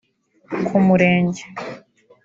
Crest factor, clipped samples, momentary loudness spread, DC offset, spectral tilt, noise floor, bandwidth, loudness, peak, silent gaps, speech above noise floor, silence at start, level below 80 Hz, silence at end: 16 dB; under 0.1%; 18 LU; under 0.1%; -7.5 dB/octave; -47 dBFS; 7.6 kHz; -17 LUFS; -4 dBFS; none; 30 dB; 0.5 s; -58 dBFS; 0.45 s